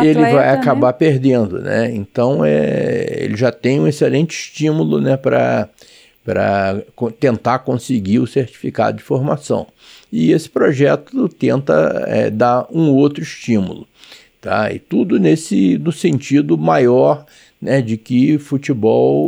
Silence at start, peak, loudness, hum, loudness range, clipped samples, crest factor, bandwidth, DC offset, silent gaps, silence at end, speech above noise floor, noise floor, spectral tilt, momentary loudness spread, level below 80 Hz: 0 s; 0 dBFS; -15 LUFS; none; 3 LU; under 0.1%; 14 dB; 15 kHz; under 0.1%; none; 0 s; 29 dB; -43 dBFS; -7 dB/octave; 8 LU; -56 dBFS